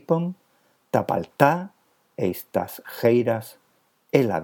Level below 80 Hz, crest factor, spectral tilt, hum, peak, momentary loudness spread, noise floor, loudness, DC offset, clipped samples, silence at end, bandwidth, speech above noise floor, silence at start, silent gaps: -68 dBFS; 24 dB; -7 dB/octave; none; 0 dBFS; 18 LU; -64 dBFS; -24 LUFS; under 0.1%; under 0.1%; 0 s; 19.5 kHz; 42 dB; 0.1 s; none